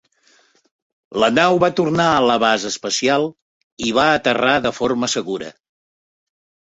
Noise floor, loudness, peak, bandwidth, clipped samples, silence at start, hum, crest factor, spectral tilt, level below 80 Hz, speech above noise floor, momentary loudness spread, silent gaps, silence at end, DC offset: -57 dBFS; -17 LUFS; -2 dBFS; 8.4 kHz; under 0.1%; 1.1 s; none; 18 dB; -3.5 dB/octave; -54 dBFS; 40 dB; 11 LU; 3.42-3.77 s; 1.15 s; under 0.1%